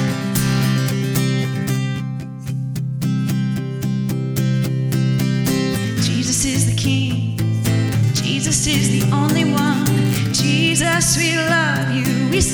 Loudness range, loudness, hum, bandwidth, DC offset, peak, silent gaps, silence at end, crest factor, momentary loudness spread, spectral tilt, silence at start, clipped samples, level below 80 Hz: 5 LU; -18 LUFS; none; over 20 kHz; under 0.1%; -4 dBFS; none; 0 s; 14 dB; 7 LU; -4.5 dB/octave; 0 s; under 0.1%; -40 dBFS